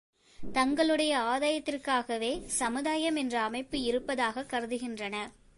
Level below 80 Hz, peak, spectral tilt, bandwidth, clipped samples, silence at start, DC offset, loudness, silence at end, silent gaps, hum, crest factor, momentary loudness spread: -58 dBFS; -16 dBFS; -2.5 dB/octave; 11.5 kHz; under 0.1%; 0.4 s; under 0.1%; -31 LUFS; 0.25 s; none; none; 16 dB; 9 LU